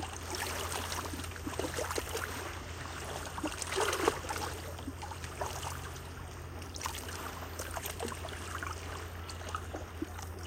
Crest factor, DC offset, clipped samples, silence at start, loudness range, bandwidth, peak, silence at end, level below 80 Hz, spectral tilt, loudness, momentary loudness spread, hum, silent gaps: 26 dB; under 0.1%; under 0.1%; 0 s; 5 LU; 16.5 kHz; -12 dBFS; 0 s; -50 dBFS; -3.5 dB/octave; -38 LUFS; 10 LU; none; none